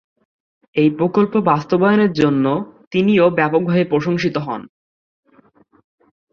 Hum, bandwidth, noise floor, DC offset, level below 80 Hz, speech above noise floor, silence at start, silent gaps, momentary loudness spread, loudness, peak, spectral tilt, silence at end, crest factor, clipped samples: none; 7 kHz; -53 dBFS; under 0.1%; -58 dBFS; 38 dB; 0.75 s; 2.87-2.91 s; 10 LU; -17 LUFS; -2 dBFS; -8 dB/octave; 1.65 s; 16 dB; under 0.1%